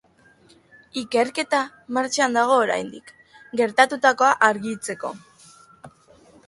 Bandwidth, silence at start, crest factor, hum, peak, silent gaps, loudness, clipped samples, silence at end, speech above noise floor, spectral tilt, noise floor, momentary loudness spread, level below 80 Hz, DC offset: 11.5 kHz; 0.95 s; 22 dB; none; -2 dBFS; none; -21 LUFS; under 0.1%; 0.6 s; 34 dB; -2.5 dB/octave; -55 dBFS; 15 LU; -68 dBFS; under 0.1%